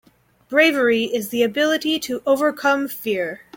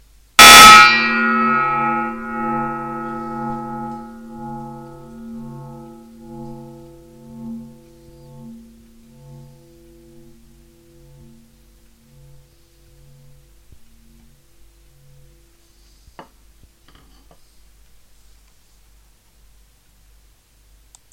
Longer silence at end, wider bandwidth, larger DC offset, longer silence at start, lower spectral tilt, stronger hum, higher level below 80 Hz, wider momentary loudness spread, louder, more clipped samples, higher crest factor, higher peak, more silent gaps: second, 0.2 s vs 13.5 s; about the same, 17 kHz vs 16.5 kHz; neither; about the same, 0.5 s vs 0.4 s; first, -3.5 dB/octave vs -1 dB/octave; neither; second, -64 dBFS vs -46 dBFS; second, 8 LU vs 32 LU; second, -19 LUFS vs -9 LUFS; second, under 0.1% vs 0.4%; about the same, 18 dB vs 18 dB; about the same, -2 dBFS vs 0 dBFS; neither